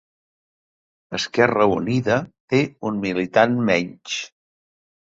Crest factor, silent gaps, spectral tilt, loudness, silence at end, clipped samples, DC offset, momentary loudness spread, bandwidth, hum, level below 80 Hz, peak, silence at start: 20 dB; 2.40-2.48 s; -5.5 dB/octave; -21 LUFS; 0.75 s; under 0.1%; under 0.1%; 11 LU; 8 kHz; none; -56 dBFS; -2 dBFS; 1.1 s